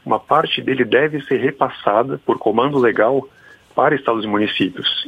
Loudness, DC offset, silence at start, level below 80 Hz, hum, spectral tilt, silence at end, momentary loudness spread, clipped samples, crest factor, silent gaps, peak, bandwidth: -17 LUFS; under 0.1%; 0.05 s; -58 dBFS; none; -7 dB/octave; 0 s; 4 LU; under 0.1%; 18 dB; none; 0 dBFS; 9 kHz